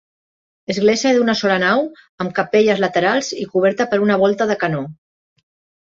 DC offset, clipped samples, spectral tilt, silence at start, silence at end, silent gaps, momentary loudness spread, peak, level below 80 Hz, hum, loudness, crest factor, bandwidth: under 0.1%; under 0.1%; -5 dB/octave; 0.7 s; 0.95 s; 2.09-2.18 s; 11 LU; -2 dBFS; -60 dBFS; none; -17 LUFS; 16 dB; 7.8 kHz